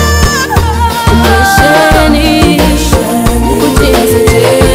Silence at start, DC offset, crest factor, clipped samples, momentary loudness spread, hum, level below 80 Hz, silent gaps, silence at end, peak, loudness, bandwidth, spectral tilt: 0 s; under 0.1%; 6 dB; 2%; 4 LU; none; -16 dBFS; none; 0 s; 0 dBFS; -7 LUFS; 16.5 kHz; -5 dB/octave